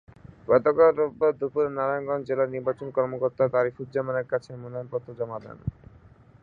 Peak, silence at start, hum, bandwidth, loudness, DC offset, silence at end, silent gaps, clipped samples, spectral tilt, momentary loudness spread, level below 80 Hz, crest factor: -6 dBFS; 0.5 s; none; 4.9 kHz; -26 LUFS; under 0.1%; 0.7 s; none; under 0.1%; -9 dB/octave; 16 LU; -56 dBFS; 20 dB